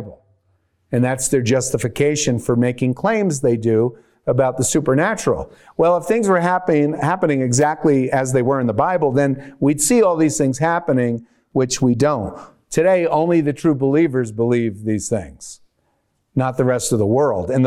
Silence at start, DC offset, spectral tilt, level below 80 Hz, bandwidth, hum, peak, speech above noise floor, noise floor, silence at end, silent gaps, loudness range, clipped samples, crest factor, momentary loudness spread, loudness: 0 s; under 0.1%; -5.5 dB/octave; -48 dBFS; 15.5 kHz; none; -4 dBFS; 50 dB; -67 dBFS; 0 s; none; 3 LU; under 0.1%; 14 dB; 8 LU; -18 LUFS